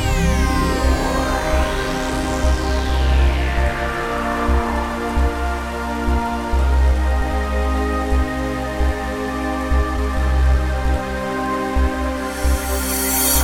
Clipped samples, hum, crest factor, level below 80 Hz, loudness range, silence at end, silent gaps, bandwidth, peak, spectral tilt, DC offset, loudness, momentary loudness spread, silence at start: under 0.1%; none; 14 dB; -20 dBFS; 2 LU; 0 s; none; 17 kHz; -4 dBFS; -5 dB/octave; under 0.1%; -20 LUFS; 5 LU; 0 s